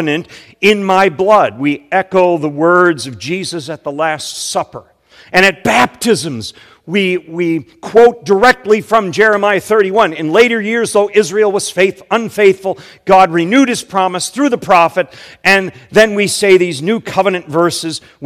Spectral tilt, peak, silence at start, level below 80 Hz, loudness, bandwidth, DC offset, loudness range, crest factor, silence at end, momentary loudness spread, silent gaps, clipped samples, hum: -4 dB/octave; 0 dBFS; 0 s; -50 dBFS; -12 LUFS; 16.5 kHz; under 0.1%; 4 LU; 12 dB; 0 s; 10 LU; none; 1%; none